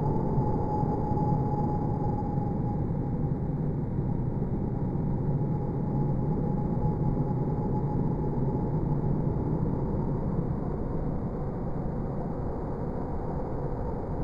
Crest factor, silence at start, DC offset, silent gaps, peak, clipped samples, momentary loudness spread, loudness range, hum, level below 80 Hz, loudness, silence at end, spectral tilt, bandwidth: 14 dB; 0 s; under 0.1%; none; -14 dBFS; under 0.1%; 5 LU; 4 LU; none; -38 dBFS; -30 LUFS; 0 s; -12 dB/octave; 5.2 kHz